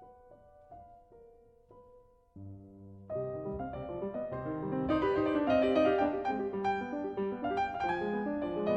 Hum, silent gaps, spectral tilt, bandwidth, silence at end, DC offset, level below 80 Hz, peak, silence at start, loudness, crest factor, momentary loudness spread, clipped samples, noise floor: none; none; -8 dB/octave; 8 kHz; 0 s; under 0.1%; -58 dBFS; -16 dBFS; 0 s; -33 LUFS; 18 dB; 23 LU; under 0.1%; -61 dBFS